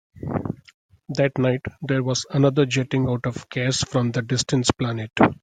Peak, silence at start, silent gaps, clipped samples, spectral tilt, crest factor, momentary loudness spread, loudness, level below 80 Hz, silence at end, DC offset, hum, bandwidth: -2 dBFS; 0.15 s; 0.74-0.89 s; under 0.1%; -5.5 dB/octave; 22 dB; 9 LU; -23 LUFS; -52 dBFS; 0.1 s; under 0.1%; none; 9.4 kHz